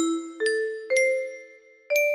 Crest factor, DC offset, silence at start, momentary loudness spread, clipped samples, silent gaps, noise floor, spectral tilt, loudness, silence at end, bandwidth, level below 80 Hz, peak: 16 dB; under 0.1%; 0 s; 11 LU; under 0.1%; none; -50 dBFS; -0.5 dB/octave; -25 LUFS; 0 s; 13 kHz; -78 dBFS; -10 dBFS